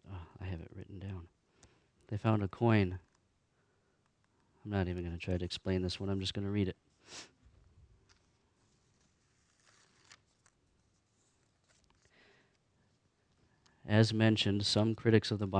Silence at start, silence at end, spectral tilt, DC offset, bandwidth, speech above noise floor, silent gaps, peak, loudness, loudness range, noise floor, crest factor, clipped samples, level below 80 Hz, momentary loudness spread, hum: 0.1 s; 0 s; -6 dB/octave; under 0.1%; 9.8 kHz; 43 dB; none; -12 dBFS; -33 LUFS; 10 LU; -75 dBFS; 24 dB; under 0.1%; -62 dBFS; 21 LU; none